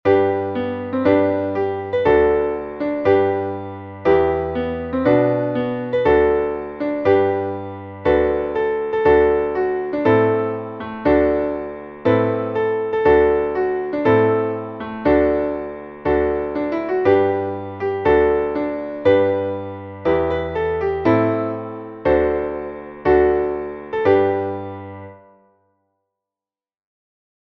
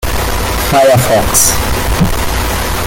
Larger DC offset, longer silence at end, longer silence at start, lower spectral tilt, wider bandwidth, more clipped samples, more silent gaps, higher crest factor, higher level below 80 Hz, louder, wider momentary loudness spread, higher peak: neither; first, 2.4 s vs 0 s; about the same, 0.05 s vs 0 s; first, -9 dB/octave vs -3.5 dB/octave; second, 5.8 kHz vs over 20 kHz; neither; neither; first, 16 dB vs 10 dB; second, -40 dBFS vs -20 dBFS; second, -19 LUFS vs -11 LUFS; first, 11 LU vs 7 LU; about the same, -2 dBFS vs 0 dBFS